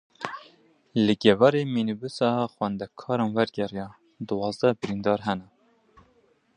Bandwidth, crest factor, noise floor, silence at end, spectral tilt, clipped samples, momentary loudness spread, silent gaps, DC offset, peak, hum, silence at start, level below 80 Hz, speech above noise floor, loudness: 10 kHz; 24 dB; -64 dBFS; 1.15 s; -6.5 dB/octave; under 0.1%; 16 LU; none; under 0.1%; -2 dBFS; none; 0.2 s; -62 dBFS; 39 dB; -26 LUFS